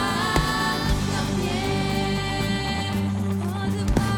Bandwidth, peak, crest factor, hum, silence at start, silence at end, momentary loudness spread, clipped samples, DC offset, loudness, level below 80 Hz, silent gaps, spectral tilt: 18.5 kHz; -4 dBFS; 18 dB; none; 0 s; 0 s; 4 LU; under 0.1%; under 0.1%; -24 LUFS; -34 dBFS; none; -5 dB/octave